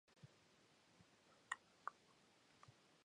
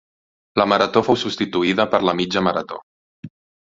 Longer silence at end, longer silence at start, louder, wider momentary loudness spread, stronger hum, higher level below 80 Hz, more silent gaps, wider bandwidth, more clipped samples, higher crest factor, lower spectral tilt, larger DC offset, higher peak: second, 0 s vs 0.35 s; second, 0.05 s vs 0.55 s; second, -54 LUFS vs -19 LUFS; first, 16 LU vs 9 LU; neither; second, under -90 dBFS vs -56 dBFS; second, none vs 2.83-3.23 s; first, 10.5 kHz vs 7.8 kHz; neither; first, 34 dB vs 20 dB; second, -2 dB/octave vs -5.5 dB/octave; neither; second, -28 dBFS vs -2 dBFS